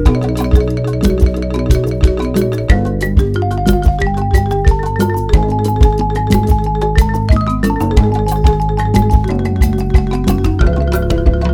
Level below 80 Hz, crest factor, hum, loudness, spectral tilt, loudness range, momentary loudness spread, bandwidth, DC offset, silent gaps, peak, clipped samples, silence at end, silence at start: -14 dBFS; 12 dB; none; -14 LUFS; -7.5 dB/octave; 1 LU; 3 LU; 17.5 kHz; 0.8%; none; 0 dBFS; 0.2%; 0 s; 0 s